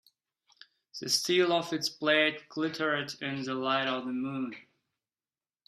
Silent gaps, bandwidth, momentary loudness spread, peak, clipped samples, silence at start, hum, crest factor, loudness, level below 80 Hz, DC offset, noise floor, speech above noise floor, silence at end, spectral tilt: none; 14 kHz; 12 LU; -10 dBFS; under 0.1%; 0.95 s; none; 22 dB; -30 LUFS; -78 dBFS; under 0.1%; under -90 dBFS; over 60 dB; 1.05 s; -3 dB/octave